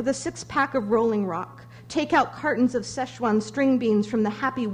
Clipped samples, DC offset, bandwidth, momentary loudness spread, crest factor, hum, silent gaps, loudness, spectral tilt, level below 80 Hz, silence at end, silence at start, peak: under 0.1%; under 0.1%; 10.5 kHz; 8 LU; 16 dB; none; none; -24 LUFS; -5.5 dB/octave; -58 dBFS; 0 s; 0 s; -8 dBFS